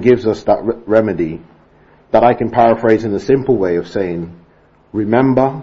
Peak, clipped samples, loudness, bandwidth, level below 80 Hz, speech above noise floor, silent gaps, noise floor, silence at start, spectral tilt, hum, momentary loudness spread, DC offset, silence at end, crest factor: 0 dBFS; under 0.1%; -15 LUFS; 7.6 kHz; -44 dBFS; 36 dB; none; -49 dBFS; 0 s; -8 dB/octave; none; 10 LU; under 0.1%; 0 s; 14 dB